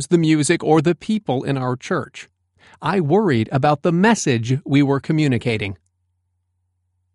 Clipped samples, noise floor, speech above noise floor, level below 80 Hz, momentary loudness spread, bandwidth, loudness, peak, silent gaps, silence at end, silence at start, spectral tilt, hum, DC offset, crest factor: under 0.1%; -70 dBFS; 52 dB; -56 dBFS; 9 LU; 11.5 kHz; -19 LUFS; -2 dBFS; none; 1.4 s; 0 s; -6 dB/octave; none; under 0.1%; 16 dB